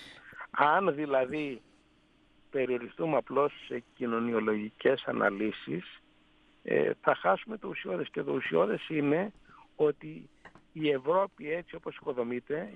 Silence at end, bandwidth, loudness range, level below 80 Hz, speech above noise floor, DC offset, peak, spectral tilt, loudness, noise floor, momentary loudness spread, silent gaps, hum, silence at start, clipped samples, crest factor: 0 s; 5.6 kHz; 3 LU; -70 dBFS; 35 dB; under 0.1%; -10 dBFS; -7.5 dB/octave; -31 LUFS; -65 dBFS; 13 LU; none; none; 0 s; under 0.1%; 22 dB